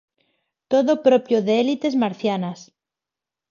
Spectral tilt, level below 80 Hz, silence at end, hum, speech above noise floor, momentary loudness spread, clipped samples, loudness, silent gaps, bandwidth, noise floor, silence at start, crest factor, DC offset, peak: -6.5 dB/octave; -72 dBFS; 0.9 s; none; 69 dB; 10 LU; under 0.1%; -20 LUFS; none; 7.2 kHz; -88 dBFS; 0.7 s; 18 dB; under 0.1%; -4 dBFS